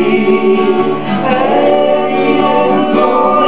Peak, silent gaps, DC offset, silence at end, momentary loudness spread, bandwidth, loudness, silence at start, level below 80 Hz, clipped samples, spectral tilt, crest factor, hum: 0 dBFS; none; 5%; 0 s; 3 LU; 4 kHz; -11 LUFS; 0 s; -60 dBFS; under 0.1%; -10 dB/octave; 10 dB; none